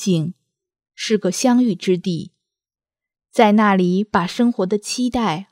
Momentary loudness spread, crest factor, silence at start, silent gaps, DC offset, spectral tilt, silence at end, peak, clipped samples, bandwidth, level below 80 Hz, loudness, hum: 10 LU; 18 dB; 0 s; none; under 0.1%; -5.5 dB/octave; 0.1 s; 0 dBFS; under 0.1%; 15 kHz; -54 dBFS; -18 LUFS; none